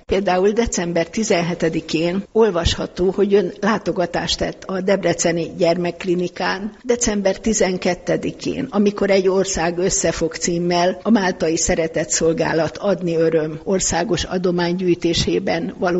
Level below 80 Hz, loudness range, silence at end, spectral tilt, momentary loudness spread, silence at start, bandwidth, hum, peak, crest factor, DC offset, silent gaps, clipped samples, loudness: -40 dBFS; 2 LU; 0 s; -4 dB/octave; 5 LU; 0.1 s; 8.2 kHz; none; -4 dBFS; 14 dB; under 0.1%; none; under 0.1%; -19 LUFS